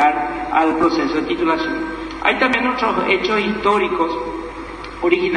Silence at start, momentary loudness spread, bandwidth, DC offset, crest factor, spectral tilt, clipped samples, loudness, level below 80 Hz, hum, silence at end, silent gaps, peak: 0 s; 10 LU; 10 kHz; under 0.1%; 18 dB; -5 dB/octave; under 0.1%; -18 LUFS; -42 dBFS; none; 0 s; none; 0 dBFS